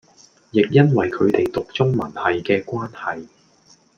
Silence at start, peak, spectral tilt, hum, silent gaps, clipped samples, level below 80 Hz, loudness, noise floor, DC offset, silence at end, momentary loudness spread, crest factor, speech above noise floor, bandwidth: 0.55 s; -2 dBFS; -8 dB/octave; none; none; under 0.1%; -56 dBFS; -20 LUFS; -54 dBFS; under 0.1%; 0.75 s; 13 LU; 18 dB; 36 dB; 7 kHz